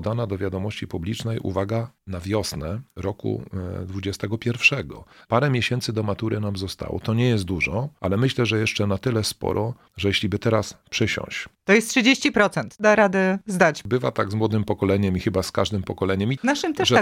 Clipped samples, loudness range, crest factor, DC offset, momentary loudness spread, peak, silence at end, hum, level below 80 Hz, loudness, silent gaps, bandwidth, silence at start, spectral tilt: under 0.1%; 8 LU; 20 dB; under 0.1%; 11 LU; -4 dBFS; 0 s; none; -50 dBFS; -23 LUFS; none; 16 kHz; 0 s; -5 dB/octave